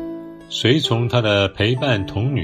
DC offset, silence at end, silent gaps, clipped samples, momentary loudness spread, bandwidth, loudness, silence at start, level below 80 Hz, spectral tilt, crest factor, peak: under 0.1%; 0 s; none; under 0.1%; 11 LU; 13.5 kHz; -18 LUFS; 0 s; -48 dBFS; -6 dB/octave; 16 dB; -2 dBFS